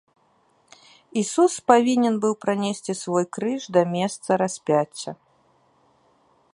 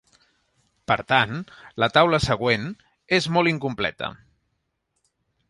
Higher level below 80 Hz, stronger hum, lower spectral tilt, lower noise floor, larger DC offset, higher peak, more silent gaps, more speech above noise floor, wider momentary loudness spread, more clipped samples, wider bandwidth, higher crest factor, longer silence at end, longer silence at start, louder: second, -72 dBFS vs -50 dBFS; neither; about the same, -5 dB/octave vs -5 dB/octave; second, -63 dBFS vs -75 dBFS; neither; about the same, -2 dBFS vs -2 dBFS; neither; second, 41 dB vs 53 dB; second, 12 LU vs 16 LU; neither; about the same, 11.5 kHz vs 11.5 kHz; about the same, 22 dB vs 22 dB; about the same, 1.4 s vs 1.35 s; first, 1.15 s vs 0.9 s; about the same, -22 LUFS vs -22 LUFS